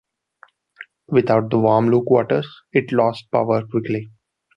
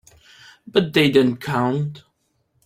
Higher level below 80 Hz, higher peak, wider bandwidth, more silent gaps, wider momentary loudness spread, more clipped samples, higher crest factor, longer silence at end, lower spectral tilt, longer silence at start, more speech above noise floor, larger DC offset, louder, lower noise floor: about the same, -60 dBFS vs -58 dBFS; about the same, -2 dBFS vs -2 dBFS; second, 6 kHz vs 16 kHz; neither; about the same, 7 LU vs 9 LU; neither; about the same, 18 dB vs 20 dB; second, 0.5 s vs 0.65 s; first, -9 dB/octave vs -6.5 dB/octave; about the same, 0.8 s vs 0.75 s; second, 35 dB vs 49 dB; neither; about the same, -19 LUFS vs -19 LUFS; second, -53 dBFS vs -68 dBFS